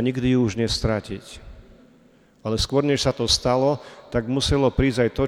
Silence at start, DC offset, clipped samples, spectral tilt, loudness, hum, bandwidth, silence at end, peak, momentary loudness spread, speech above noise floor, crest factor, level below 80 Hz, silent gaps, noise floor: 0 s; under 0.1%; under 0.1%; -5 dB/octave; -22 LUFS; none; 14.5 kHz; 0 s; -6 dBFS; 14 LU; 33 dB; 16 dB; -36 dBFS; none; -55 dBFS